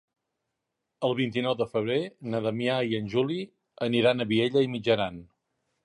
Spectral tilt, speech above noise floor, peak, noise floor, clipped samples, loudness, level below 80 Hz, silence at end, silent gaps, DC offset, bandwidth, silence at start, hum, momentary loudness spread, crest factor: -7 dB/octave; 56 dB; -10 dBFS; -83 dBFS; under 0.1%; -27 LUFS; -64 dBFS; 0.6 s; none; under 0.1%; 11.5 kHz; 1 s; none; 9 LU; 18 dB